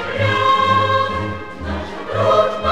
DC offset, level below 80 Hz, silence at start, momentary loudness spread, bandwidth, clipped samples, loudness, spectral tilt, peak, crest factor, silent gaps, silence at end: 1%; -38 dBFS; 0 s; 12 LU; 11.5 kHz; under 0.1%; -17 LUFS; -5.5 dB/octave; -2 dBFS; 14 dB; none; 0 s